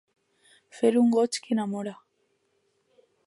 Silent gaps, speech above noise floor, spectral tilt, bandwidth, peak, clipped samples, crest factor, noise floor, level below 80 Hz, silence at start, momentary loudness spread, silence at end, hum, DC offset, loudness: none; 48 dB; -5 dB/octave; 11.5 kHz; -10 dBFS; under 0.1%; 18 dB; -72 dBFS; -80 dBFS; 0.75 s; 12 LU; 1.3 s; none; under 0.1%; -25 LUFS